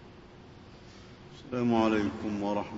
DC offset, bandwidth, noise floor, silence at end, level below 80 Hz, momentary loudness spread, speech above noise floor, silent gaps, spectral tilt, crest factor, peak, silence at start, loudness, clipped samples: under 0.1%; 8 kHz; -51 dBFS; 0 s; -58 dBFS; 25 LU; 22 dB; none; -7 dB/octave; 18 dB; -14 dBFS; 0 s; -30 LUFS; under 0.1%